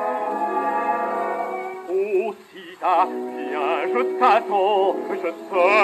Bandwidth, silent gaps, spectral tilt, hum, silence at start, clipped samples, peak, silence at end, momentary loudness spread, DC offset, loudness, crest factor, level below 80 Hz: 13 kHz; none; -4.5 dB/octave; none; 0 s; under 0.1%; -4 dBFS; 0 s; 10 LU; under 0.1%; -22 LUFS; 16 dB; -80 dBFS